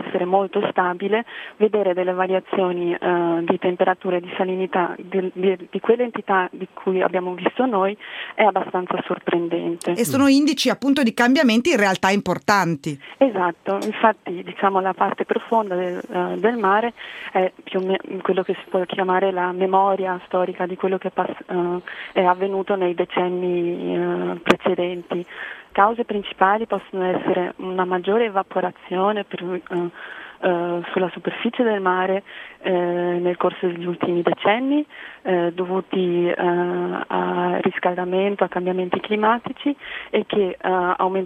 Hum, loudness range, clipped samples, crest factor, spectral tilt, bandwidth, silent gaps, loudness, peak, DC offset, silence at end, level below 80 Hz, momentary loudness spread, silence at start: none; 4 LU; under 0.1%; 20 dB; -5.5 dB/octave; 15.5 kHz; none; -21 LUFS; 0 dBFS; under 0.1%; 0 s; -64 dBFS; 7 LU; 0 s